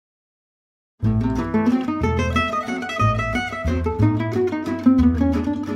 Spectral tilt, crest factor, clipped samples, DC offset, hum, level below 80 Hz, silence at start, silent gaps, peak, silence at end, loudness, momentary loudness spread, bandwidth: -7.5 dB/octave; 16 dB; under 0.1%; under 0.1%; none; -32 dBFS; 1 s; none; -4 dBFS; 0 s; -21 LUFS; 6 LU; 10.5 kHz